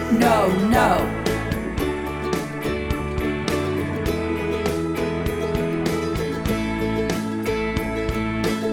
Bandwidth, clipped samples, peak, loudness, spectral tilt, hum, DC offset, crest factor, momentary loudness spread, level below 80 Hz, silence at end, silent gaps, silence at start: over 20 kHz; under 0.1%; -4 dBFS; -23 LUFS; -6 dB/octave; none; under 0.1%; 18 dB; 8 LU; -34 dBFS; 0 s; none; 0 s